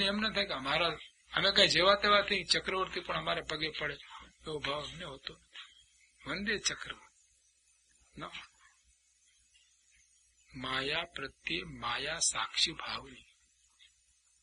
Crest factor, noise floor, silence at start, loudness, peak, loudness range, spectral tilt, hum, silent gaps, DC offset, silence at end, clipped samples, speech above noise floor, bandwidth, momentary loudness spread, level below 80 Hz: 24 dB; -71 dBFS; 0 s; -32 LUFS; -10 dBFS; 15 LU; -2 dB/octave; none; none; under 0.1%; 1.25 s; under 0.1%; 37 dB; 11.5 kHz; 22 LU; -60 dBFS